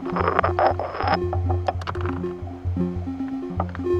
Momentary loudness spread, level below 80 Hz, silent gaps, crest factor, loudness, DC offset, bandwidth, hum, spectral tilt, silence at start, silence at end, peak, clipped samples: 8 LU; -44 dBFS; none; 22 dB; -25 LUFS; under 0.1%; 7 kHz; none; -8.5 dB/octave; 0 s; 0 s; -2 dBFS; under 0.1%